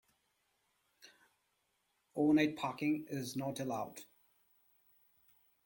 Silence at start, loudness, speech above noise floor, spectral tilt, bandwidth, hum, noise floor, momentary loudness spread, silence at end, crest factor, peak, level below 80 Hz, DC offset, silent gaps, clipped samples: 2.15 s; -36 LUFS; 45 dB; -5.5 dB/octave; 17 kHz; none; -81 dBFS; 17 LU; 1.6 s; 20 dB; -20 dBFS; -78 dBFS; under 0.1%; none; under 0.1%